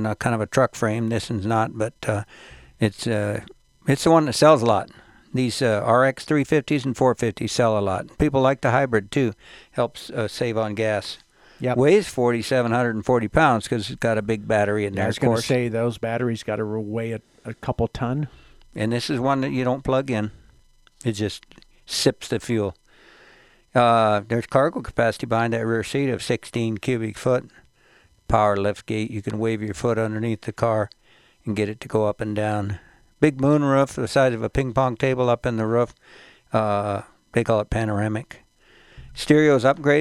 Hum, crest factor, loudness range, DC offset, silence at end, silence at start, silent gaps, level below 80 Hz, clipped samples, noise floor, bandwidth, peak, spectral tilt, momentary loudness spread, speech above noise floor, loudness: none; 20 dB; 5 LU; under 0.1%; 0 s; 0 s; none; -46 dBFS; under 0.1%; -57 dBFS; 14 kHz; -2 dBFS; -6 dB/octave; 11 LU; 35 dB; -22 LUFS